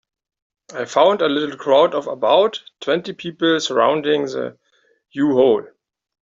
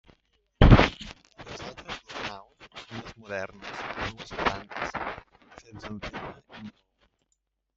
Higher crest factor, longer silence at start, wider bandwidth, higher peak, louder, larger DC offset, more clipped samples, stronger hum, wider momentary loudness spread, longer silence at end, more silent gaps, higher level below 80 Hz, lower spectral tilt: second, 16 dB vs 26 dB; about the same, 0.7 s vs 0.6 s; about the same, 7.8 kHz vs 7.6 kHz; about the same, -2 dBFS vs -2 dBFS; first, -18 LUFS vs -27 LUFS; neither; neither; neither; second, 13 LU vs 26 LU; second, 0.6 s vs 1.05 s; neither; second, -64 dBFS vs -34 dBFS; second, -4.5 dB/octave vs -6.5 dB/octave